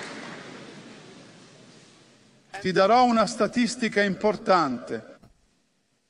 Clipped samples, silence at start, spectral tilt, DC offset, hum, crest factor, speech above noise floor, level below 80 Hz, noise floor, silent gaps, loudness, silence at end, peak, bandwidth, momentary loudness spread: under 0.1%; 0 s; -4.5 dB/octave; under 0.1%; none; 20 dB; 48 dB; -62 dBFS; -70 dBFS; none; -23 LUFS; 0.95 s; -6 dBFS; 11 kHz; 23 LU